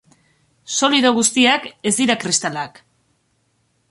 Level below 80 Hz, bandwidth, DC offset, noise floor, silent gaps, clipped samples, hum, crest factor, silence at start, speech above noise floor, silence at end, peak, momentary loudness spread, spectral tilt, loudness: -64 dBFS; 11.5 kHz; under 0.1%; -65 dBFS; none; under 0.1%; none; 18 dB; 0.7 s; 47 dB; 1.25 s; -2 dBFS; 11 LU; -2 dB/octave; -17 LUFS